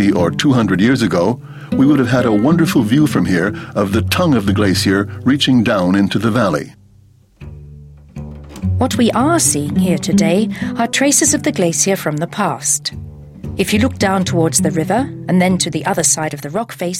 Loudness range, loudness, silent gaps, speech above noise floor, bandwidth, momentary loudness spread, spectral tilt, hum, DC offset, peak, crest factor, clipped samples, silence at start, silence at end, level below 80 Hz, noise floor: 4 LU; -14 LUFS; none; 33 dB; 16.5 kHz; 10 LU; -4.5 dB/octave; none; under 0.1%; 0 dBFS; 14 dB; under 0.1%; 0 s; 0 s; -44 dBFS; -48 dBFS